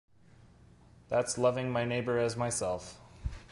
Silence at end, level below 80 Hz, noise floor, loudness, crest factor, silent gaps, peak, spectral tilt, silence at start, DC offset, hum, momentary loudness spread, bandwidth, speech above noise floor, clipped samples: 0.05 s; -50 dBFS; -59 dBFS; -32 LUFS; 18 dB; none; -14 dBFS; -4.5 dB/octave; 0.4 s; under 0.1%; none; 14 LU; 11.5 kHz; 28 dB; under 0.1%